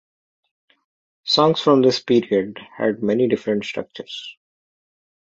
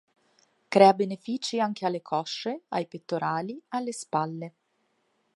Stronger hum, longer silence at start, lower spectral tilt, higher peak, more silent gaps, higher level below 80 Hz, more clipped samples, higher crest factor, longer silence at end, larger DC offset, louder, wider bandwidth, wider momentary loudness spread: neither; first, 1.25 s vs 0.7 s; about the same, -5.5 dB/octave vs -5 dB/octave; about the same, -2 dBFS vs -4 dBFS; neither; first, -64 dBFS vs -82 dBFS; neither; about the same, 20 dB vs 24 dB; about the same, 0.9 s vs 0.85 s; neither; first, -19 LUFS vs -27 LUFS; second, 7.8 kHz vs 11.5 kHz; first, 17 LU vs 14 LU